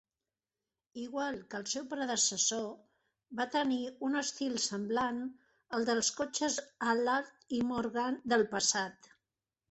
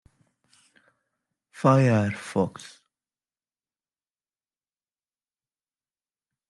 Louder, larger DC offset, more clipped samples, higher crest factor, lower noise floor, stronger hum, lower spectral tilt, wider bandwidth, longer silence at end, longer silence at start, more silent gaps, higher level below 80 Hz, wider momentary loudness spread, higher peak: second, -33 LUFS vs -23 LUFS; neither; neither; about the same, 22 dB vs 24 dB; about the same, under -90 dBFS vs under -90 dBFS; neither; second, -2 dB/octave vs -7.5 dB/octave; second, 8.4 kHz vs 11.5 kHz; second, 0.8 s vs 4 s; second, 0.95 s vs 1.6 s; neither; about the same, -72 dBFS vs -68 dBFS; about the same, 11 LU vs 10 LU; second, -14 dBFS vs -6 dBFS